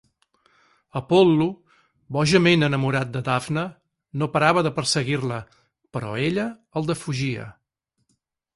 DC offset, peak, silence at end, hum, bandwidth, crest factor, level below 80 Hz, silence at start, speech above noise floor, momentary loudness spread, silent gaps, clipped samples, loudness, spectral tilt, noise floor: under 0.1%; -4 dBFS; 1.05 s; none; 11.5 kHz; 20 dB; -56 dBFS; 0.95 s; 54 dB; 16 LU; none; under 0.1%; -22 LUFS; -5.5 dB/octave; -76 dBFS